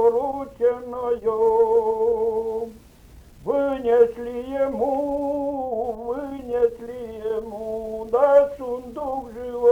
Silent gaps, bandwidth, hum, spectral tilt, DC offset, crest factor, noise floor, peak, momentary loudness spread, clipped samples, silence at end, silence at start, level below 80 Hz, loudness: none; 7.8 kHz; none; -7 dB/octave; under 0.1%; 16 dB; -47 dBFS; -6 dBFS; 12 LU; under 0.1%; 0 s; 0 s; -50 dBFS; -23 LUFS